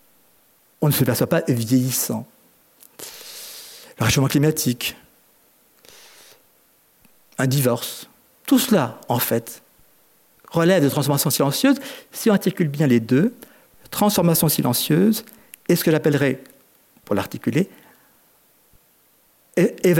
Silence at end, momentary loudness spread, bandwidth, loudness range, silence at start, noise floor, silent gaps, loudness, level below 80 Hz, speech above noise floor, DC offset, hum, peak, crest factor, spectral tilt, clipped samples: 0 s; 17 LU; 17 kHz; 7 LU; 0.8 s; -59 dBFS; none; -20 LUFS; -56 dBFS; 39 dB; under 0.1%; none; -4 dBFS; 16 dB; -5 dB/octave; under 0.1%